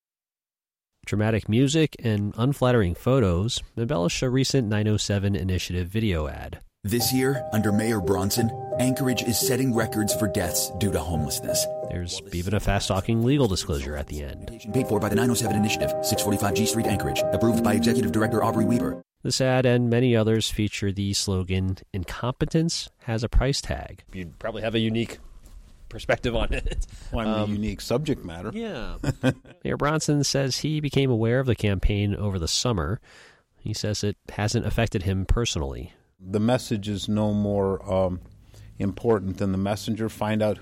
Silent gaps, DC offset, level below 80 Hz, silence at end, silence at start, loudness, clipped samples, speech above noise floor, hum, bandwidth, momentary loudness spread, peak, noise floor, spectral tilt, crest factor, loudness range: none; under 0.1%; -38 dBFS; 0 s; 1.05 s; -25 LUFS; under 0.1%; over 66 dB; none; 16.5 kHz; 11 LU; -10 dBFS; under -90 dBFS; -5 dB/octave; 14 dB; 5 LU